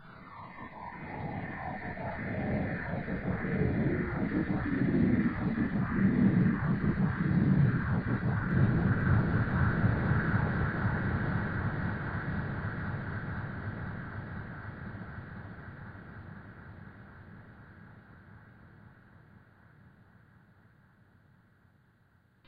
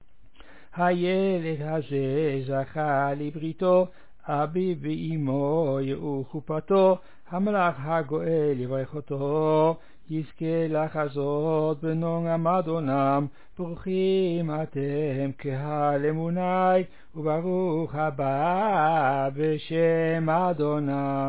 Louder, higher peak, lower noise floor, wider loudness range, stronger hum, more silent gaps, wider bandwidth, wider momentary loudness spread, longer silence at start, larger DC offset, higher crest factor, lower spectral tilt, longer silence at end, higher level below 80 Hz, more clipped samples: second, -31 LUFS vs -26 LUFS; second, -14 dBFS vs -10 dBFS; first, -66 dBFS vs -54 dBFS; first, 18 LU vs 2 LU; neither; neither; first, 5 kHz vs 4 kHz; first, 20 LU vs 9 LU; second, 0 s vs 0.4 s; second, under 0.1% vs 0.7%; about the same, 18 dB vs 14 dB; about the same, -11.5 dB/octave vs -11.5 dB/octave; first, 3.1 s vs 0 s; first, -46 dBFS vs -62 dBFS; neither